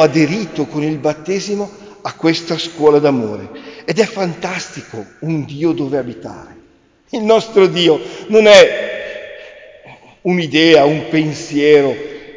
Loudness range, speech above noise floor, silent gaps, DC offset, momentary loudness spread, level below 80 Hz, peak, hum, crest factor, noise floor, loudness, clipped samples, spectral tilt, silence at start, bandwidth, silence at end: 8 LU; 37 dB; none; under 0.1%; 18 LU; -54 dBFS; 0 dBFS; none; 14 dB; -50 dBFS; -14 LUFS; under 0.1%; -5 dB/octave; 0 s; 8 kHz; 0.05 s